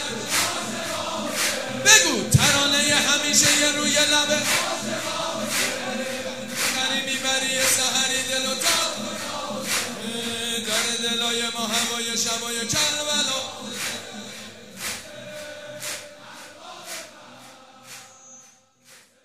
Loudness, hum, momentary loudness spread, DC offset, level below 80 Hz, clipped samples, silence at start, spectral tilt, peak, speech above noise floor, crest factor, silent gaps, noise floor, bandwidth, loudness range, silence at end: -21 LUFS; none; 19 LU; 0.4%; -58 dBFS; under 0.1%; 0 s; -1.5 dB/octave; 0 dBFS; 32 dB; 24 dB; none; -54 dBFS; 16 kHz; 18 LU; 0.2 s